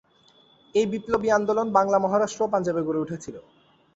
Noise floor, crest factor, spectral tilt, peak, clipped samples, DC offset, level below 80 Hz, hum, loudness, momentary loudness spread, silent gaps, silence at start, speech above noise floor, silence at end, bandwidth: -59 dBFS; 20 dB; -5.5 dB/octave; -6 dBFS; under 0.1%; under 0.1%; -60 dBFS; none; -24 LUFS; 8 LU; none; 0.75 s; 35 dB; 0.55 s; 8 kHz